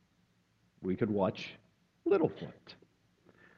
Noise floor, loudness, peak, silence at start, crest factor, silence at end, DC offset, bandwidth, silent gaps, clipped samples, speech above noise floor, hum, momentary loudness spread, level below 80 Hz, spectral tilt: -72 dBFS; -34 LUFS; -16 dBFS; 0.8 s; 20 dB; 0.85 s; under 0.1%; 7 kHz; none; under 0.1%; 39 dB; none; 18 LU; -72 dBFS; -8 dB/octave